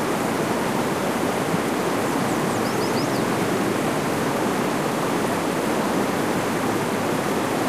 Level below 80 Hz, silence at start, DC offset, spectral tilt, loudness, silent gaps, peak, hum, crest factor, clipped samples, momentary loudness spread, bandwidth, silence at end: -54 dBFS; 0 s; 0.2%; -4.5 dB/octave; -23 LUFS; none; -10 dBFS; none; 12 dB; under 0.1%; 1 LU; 15.5 kHz; 0 s